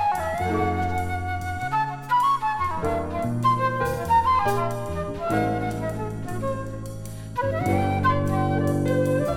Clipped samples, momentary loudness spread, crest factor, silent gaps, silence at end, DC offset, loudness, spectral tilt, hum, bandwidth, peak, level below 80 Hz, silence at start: under 0.1%; 9 LU; 14 dB; none; 0 s; under 0.1%; -24 LUFS; -7 dB/octave; none; 17.5 kHz; -8 dBFS; -42 dBFS; 0 s